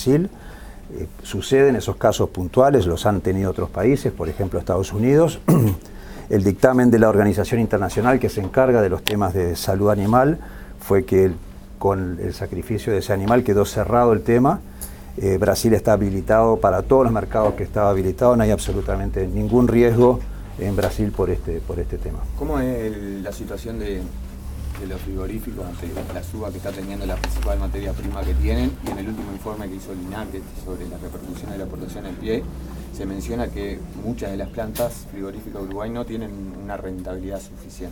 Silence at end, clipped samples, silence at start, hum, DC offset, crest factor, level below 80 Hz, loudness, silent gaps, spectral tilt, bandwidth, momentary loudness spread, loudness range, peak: 0 s; under 0.1%; 0 s; none; under 0.1%; 20 dB; -32 dBFS; -21 LUFS; none; -7 dB/octave; 18 kHz; 16 LU; 12 LU; 0 dBFS